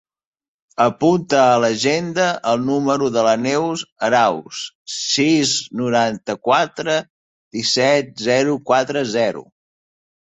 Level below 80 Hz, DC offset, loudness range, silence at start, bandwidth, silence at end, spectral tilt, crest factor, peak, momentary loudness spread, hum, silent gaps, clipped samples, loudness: -62 dBFS; under 0.1%; 2 LU; 0.8 s; 8.4 kHz; 0.85 s; -4 dB/octave; 16 dB; -2 dBFS; 9 LU; none; 3.92-3.96 s, 4.75-4.86 s, 7.10-7.51 s; under 0.1%; -18 LUFS